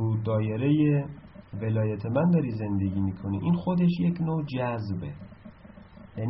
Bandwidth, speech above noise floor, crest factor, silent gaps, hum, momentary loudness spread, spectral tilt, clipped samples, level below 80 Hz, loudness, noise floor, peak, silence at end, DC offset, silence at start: 5.8 kHz; 23 dB; 14 dB; none; none; 16 LU; -9 dB/octave; under 0.1%; -56 dBFS; -27 LUFS; -49 dBFS; -14 dBFS; 0 s; under 0.1%; 0 s